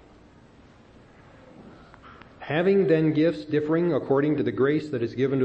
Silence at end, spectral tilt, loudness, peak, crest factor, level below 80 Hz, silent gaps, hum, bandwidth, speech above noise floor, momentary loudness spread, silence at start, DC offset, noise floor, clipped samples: 0 s; -9 dB/octave; -24 LUFS; -8 dBFS; 16 dB; -60 dBFS; none; none; 8 kHz; 30 dB; 7 LU; 1.6 s; under 0.1%; -52 dBFS; under 0.1%